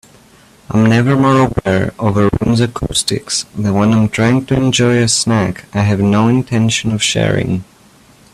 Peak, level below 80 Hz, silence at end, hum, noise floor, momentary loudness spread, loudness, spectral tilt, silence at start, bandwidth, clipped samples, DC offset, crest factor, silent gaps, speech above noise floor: 0 dBFS; -38 dBFS; 0.7 s; none; -45 dBFS; 6 LU; -13 LUFS; -5 dB/octave; 0.7 s; 13.5 kHz; under 0.1%; under 0.1%; 14 dB; none; 32 dB